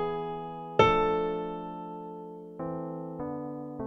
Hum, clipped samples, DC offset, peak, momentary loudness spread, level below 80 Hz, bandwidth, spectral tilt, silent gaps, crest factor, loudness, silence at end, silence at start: none; under 0.1%; under 0.1%; -6 dBFS; 17 LU; -52 dBFS; 7.4 kHz; -6.5 dB/octave; none; 26 dB; -31 LUFS; 0 s; 0 s